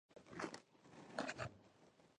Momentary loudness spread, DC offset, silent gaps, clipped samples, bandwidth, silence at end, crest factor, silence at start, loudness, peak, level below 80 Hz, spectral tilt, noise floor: 20 LU; under 0.1%; none; under 0.1%; 11 kHz; 0.05 s; 26 dB; 0.1 s; -50 LUFS; -26 dBFS; -78 dBFS; -4.5 dB/octave; -70 dBFS